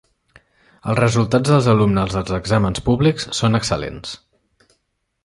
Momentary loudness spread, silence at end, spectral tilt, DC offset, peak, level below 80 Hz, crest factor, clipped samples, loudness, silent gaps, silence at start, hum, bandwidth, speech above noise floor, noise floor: 15 LU; 1.1 s; -6 dB/octave; under 0.1%; -2 dBFS; -40 dBFS; 16 dB; under 0.1%; -18 LUFS; none; 0.85 s; none; 11.5 kHz; 54 dB; -71 dBFS